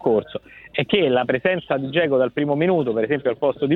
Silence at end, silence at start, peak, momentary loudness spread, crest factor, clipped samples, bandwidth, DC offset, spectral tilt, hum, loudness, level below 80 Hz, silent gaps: 0 s; 0 s; -4 dBFS; 7 LU; 16 dB; under 0.1%; 4.3 kHz; under 0.1%; -9 dB/octave; none; -21 LUFS; -58 dBFS; none